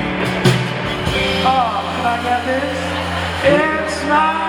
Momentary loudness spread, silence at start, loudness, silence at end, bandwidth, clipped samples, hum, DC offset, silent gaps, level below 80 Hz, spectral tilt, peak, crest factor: 6 LU; 0 s; -17 LUFS; 0 s; 19 kHz; under 0.1%; none; under 0.1%; none; -38 dBFS; -5 dB/octave; 0 dBFS; 16 dB